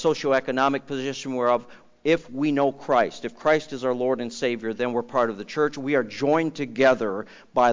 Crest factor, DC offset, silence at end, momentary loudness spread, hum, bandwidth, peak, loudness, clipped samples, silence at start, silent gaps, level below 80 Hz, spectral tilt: 14 dB; under 0.1%; 0 s; 7 LU; none; 7.6 kHz; -8 dBFS; -24 LUFS; under 0.1%; 0 s; none; -64 dBFS; -5.5 dB/octave